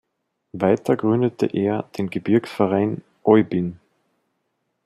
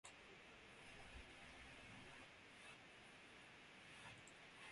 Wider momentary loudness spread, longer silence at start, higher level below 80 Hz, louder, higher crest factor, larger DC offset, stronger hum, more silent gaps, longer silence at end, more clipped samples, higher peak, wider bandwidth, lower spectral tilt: first, 9 LU vs 3 LU; first, 0.55 s vs 0.05 s; first, -64 dBFS vs -74 dBFS; first, -21 LUFS vs -61 LUFS; about the same, 20 dB vs 20 dB; neither; neither; neither; first, 1.1 s vs 0 s; neither; first, -2 dBFS vs -42 dBFS; about the same, 12.5 kHz vs 11.5 kHz; first, -8.5 dB/octave vs -3 dB/octave